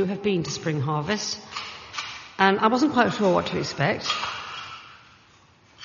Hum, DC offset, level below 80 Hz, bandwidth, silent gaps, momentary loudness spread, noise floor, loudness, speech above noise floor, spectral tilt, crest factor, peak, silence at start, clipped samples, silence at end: none; under 0.1%; -60 dBFS; 7.2 kHz; none; 14 LU; -56 dBFS; -24 LUFS; 32 dB; -3.5 dB/octave; 22 dB; -4 dBFS; 0 s; under 0.1%; 0 s